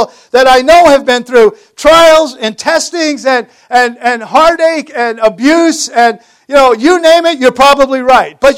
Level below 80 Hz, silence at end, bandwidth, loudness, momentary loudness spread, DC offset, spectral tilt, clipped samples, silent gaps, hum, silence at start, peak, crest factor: -40 dBFS; 0 s; 16.5 kHz; -8 LUFS; 8 LU; under 0.1%; -2.5 dB/octave; 4%; none; none; 0 s; 0 dBFS; 8 dB